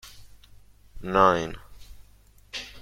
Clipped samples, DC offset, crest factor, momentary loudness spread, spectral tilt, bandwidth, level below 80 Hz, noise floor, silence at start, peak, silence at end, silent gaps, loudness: under 0.1%; under 0.1%; 24 dB; 20 LU; -5 dB/octave; 16.5 kHz; -48 dBFS; -55 dBFS; 0.05 s; -4 dBFS; 0 s; none; -24 LUFS